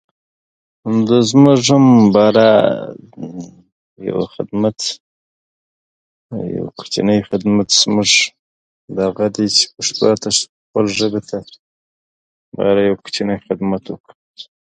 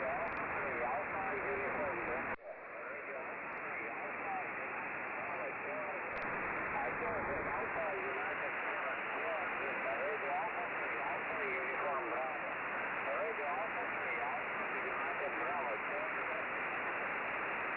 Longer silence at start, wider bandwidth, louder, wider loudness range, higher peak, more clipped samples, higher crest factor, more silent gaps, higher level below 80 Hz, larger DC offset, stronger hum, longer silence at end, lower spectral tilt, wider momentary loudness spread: first, 0.85 s vs 0 s; first, 9.4 kHz vs 5 kHz; first, -14 LUFS vs -38 LUFS; first, 11 LU vs 3 LU; first, 0 dBFS vs -28 dBFS; neither; about the same, 16 dB vs 12 dB; first, 3.72-3.96 s, 5.00-6.29 s, 8.39-8.88 s, 10.49-10.74 s, 11.59-12.52 s, 14.00-14.04 s, 14.15-14.34 s vs none; first, -54 dBFS vs -68 dBFS; neither; neither; first, 0.15 s vs 0 s; first, -4.5 dB/octave vs -2.5 dB/octave; first, 19 LU vs 3 LU